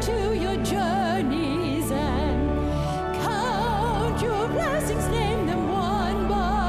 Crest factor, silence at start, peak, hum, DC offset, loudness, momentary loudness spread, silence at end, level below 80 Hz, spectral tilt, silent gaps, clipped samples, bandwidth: 10 dB; 0 s; -12 dBFS; none; under 0.1%; -25 LUFS; 2 LU; 0 s; -34 dBFS; -6 dB/octave; none; under 0.1%; 16 kHz